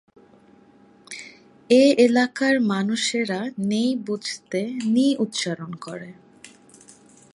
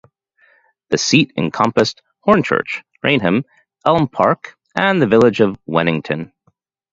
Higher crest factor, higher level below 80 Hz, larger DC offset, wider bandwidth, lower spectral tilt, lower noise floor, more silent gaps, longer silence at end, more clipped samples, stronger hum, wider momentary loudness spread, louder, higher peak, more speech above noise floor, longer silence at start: about the same, 18 dB vs 18 dB; second, -72 dBFS vs -52 dBFS; neither; first, 11.5 kHz vs 7.8 kHz; about the same, -4.5 dB/octave vs -5 dB/octave; second, -53 dBFS vs -62 dBFS; neither; first, 0.85 s vs 0.7 s; neither; neither; first, 21 LU vs 11 LU; second, -21 LUFS vs -16 LUFS; second, -4 dBFS vs 0 dBFS; second, 32 dB vs 47 dB; first, 1.1 s vs 0.9 s